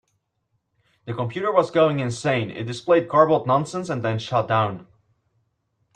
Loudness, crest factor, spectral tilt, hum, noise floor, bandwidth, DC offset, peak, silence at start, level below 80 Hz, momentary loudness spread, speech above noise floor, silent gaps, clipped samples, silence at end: -22 LUFS; 20 dB; -6.5 dB/octave; none; -73 dBFS; 10.5 kHz; under 0.1%; -4 dBFS; 1.05 s; -62 dBFS; 11 LU; 52 dB; none; under 0.1%; 1.1 s